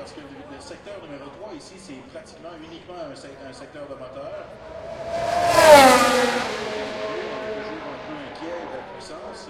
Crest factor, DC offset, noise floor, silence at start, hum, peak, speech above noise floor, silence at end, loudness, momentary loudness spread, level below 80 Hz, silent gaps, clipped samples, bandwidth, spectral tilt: 22 dB; under 0.1%; -40 dBFS; 0 s; none; 0 dBFS; 18 dB; 0 s; -18 LUFS; 25 LU; -52 dBFS; none; under 0.1%; 16.5 kHz; -3 dB/octave